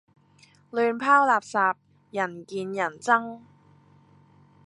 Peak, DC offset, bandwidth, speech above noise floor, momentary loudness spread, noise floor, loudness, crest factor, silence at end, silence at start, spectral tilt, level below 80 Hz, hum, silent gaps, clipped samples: -6 dBFS; under 0.1%; 11.5 kHz; 34 dB; 16 LU; -58 dBFS; -24 LUFS; 22 dB; 1.3 s; 0.75 s; -4.5 dB/octave; -76 dBFS; none; none; under 0.1%